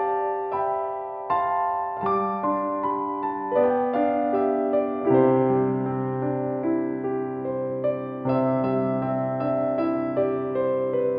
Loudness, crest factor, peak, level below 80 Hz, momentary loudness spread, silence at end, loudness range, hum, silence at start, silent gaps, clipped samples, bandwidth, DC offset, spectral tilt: -25 LUFS; 16 dB; -8 dBFS; -64 dBFS; 6 LU; 0 s; 3 LU; none; 0 s; none; under 0.1%; 5 kHz; under 0.1%; -11.5 dB/octave